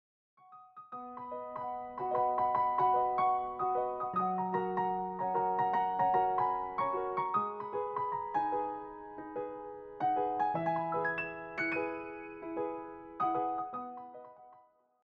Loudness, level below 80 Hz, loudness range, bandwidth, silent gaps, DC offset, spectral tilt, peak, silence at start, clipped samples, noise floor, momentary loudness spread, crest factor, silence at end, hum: -34 LUFS; -68 dBFS; 4 LU; 5.4 kHz; none; under 0.1%; -5 dB/octave; -18 dBFS; 0.5 s; under 0.1%; -64 dBFS; 16 LU; 16 dB; 0.45 s; none